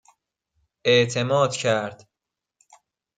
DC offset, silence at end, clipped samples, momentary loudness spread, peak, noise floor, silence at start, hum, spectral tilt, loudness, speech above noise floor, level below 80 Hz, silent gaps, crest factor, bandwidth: under 0.1%; 1.25 s; under 0.1%; 8 LU; -6 dBFS; -86 dBFS; 0.85 s; none; -4 dB/octave; -21 LUFS; 65 dB; -66 dBFS; none; 20 dB; 9.4 kHz